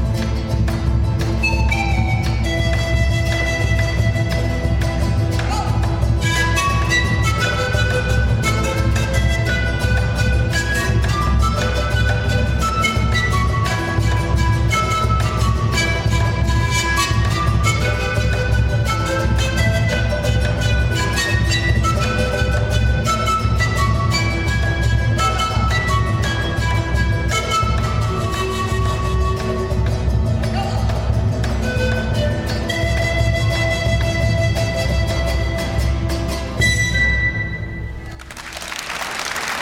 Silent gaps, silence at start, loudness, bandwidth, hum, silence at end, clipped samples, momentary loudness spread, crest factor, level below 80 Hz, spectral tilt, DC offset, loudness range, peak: none; 0 s; -18 LUFS; 15.5 kHz; none; 0 s; under 0.1%; 4 LU; 14 dB; -22 dBFS; -5 dB/octave; under 0.1%; 2 LU; -4 dBFS